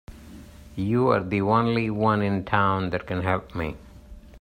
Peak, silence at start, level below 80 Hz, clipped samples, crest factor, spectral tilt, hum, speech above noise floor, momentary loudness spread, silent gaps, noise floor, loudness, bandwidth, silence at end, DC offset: -6 dBFS; 0.1 s; -48 dBFS; under 0.1%; 18 dB; -8 dB/octave; none; 21 dB; 15 LU; none; -45 dBFS; -24 LUFS; 10 kHz; 0 s; under 0.1%